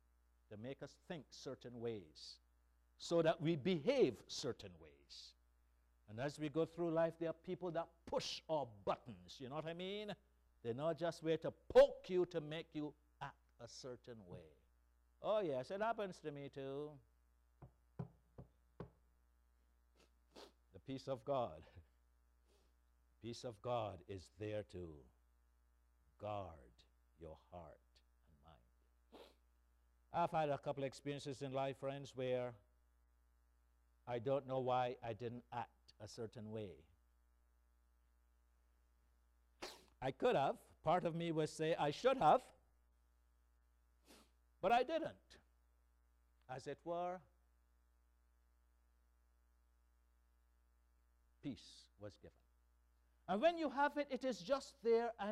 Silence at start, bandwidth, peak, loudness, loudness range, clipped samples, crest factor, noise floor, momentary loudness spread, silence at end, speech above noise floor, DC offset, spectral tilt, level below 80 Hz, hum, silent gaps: 0.5 s; 13 kHz; -20 dBFS; -42 LUFS; 18 LU; under 0.1%; 26 dB; -76 dBFS; 20 LU; 0 s; 34 dB; under 0.1%; -6 dB/octave; -72 dBFS; 60 Hz at -75 dBFS; none